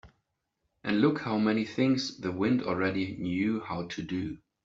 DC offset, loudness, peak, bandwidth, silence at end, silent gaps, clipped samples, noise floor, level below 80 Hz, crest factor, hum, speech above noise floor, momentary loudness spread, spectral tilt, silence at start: under 0.1%; -30 LUFS; -12 dBFS; 7.8 kHz; 0.3 s; none; under 0.1%; -81 dBFS; -62 dBFS; 18 dB; none; 52 dB; 9 LU; -6 dB/octave; 0.05 s